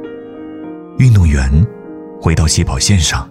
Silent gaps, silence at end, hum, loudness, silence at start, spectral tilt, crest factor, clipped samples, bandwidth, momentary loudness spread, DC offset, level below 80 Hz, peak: none; 0 s; none; -12 LUFS; 0 s; -4.5 dB/octave; 12 dB; under 0.1%; 14.5 kHz; 19 LU; under 0.1%; -20 dBFS; 0 dBFS